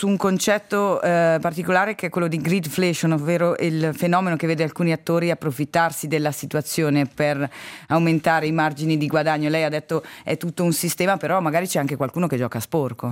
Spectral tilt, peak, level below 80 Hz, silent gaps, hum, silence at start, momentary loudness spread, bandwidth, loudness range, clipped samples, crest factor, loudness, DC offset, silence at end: -5.5 dB/octave; -6 dBFS; -64 dBFS; none; none; 0 s; 5 LU; 17 kHz; 2 LU; under 0.1%; 16 dB; -21 LUFS; under 0.1%; 0 s